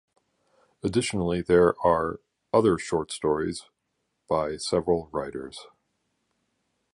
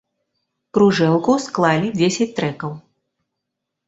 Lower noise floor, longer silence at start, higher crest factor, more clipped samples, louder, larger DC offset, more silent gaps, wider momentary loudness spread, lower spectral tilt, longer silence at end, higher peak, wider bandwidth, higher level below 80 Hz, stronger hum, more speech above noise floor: about the same, -78 dBFS vs -80 dBFS; about the same, 0.85 s vs 0.75 s; about the same, 20 dB vs 18 dB; neither; second, -26 LUFS vs -18 LUFS; neither; neither; first, 16 LU vs 13 LU; about the same, -5.5 dB/octave vs -5.5 dB/octave; first, 1.3 s vs 1.1 s; second, -8 dBFS vs -2 dBFS; first, 11.5 kHz vs 8 kHz; first, -52 dBFS vs -58 dBFS; neither; second, 53 dB vs 62 dB